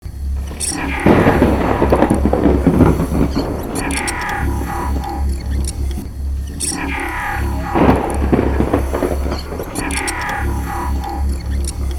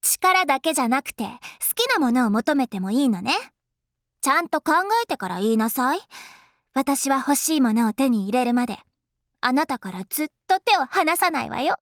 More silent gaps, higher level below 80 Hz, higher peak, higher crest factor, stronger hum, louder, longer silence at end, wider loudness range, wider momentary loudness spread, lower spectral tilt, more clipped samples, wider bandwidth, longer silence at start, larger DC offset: neither; first, -22 dBFS vs -66 dBFS; first, 0 dBFS vs -6 dBFS; about the same, 16 dB vs 16 dB; neither; first, -17 LUFS vs -22 LUFS; about the same, 0 s vs 0.05 s; first, 7 LU vs 1 LU; about the same, 10 LU vs 9 LU; first, -5.5 dB/octave vs -3 dB/octave; neither; second, 16.5 kHz vs over 20 kHz; about the same, 0.05 s vs 0.05 s; neither